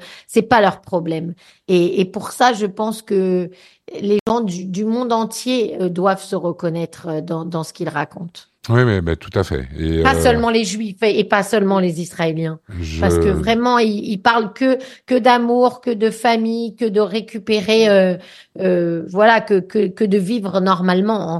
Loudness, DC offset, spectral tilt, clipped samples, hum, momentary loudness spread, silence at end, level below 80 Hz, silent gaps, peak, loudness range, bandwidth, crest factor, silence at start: -17 LUFS; under 0.1%; -6 dB/octave; under 0.1%; none; 11 LU; 0 s; -38 dBFS; 4.21-4.26 s; 0 dBFS; 5 LU; 12.5 kHz; 18 dB; 0 s